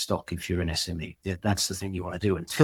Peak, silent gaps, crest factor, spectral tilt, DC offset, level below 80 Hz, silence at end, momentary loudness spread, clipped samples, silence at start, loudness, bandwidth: -6 dBFS; none; 22 dB; -4.5 dB/octave; under 0.1%; -46 dBFS; 0 s; 7 LU; under 0.1%; 0 s; -29 LUFS; 18 kHz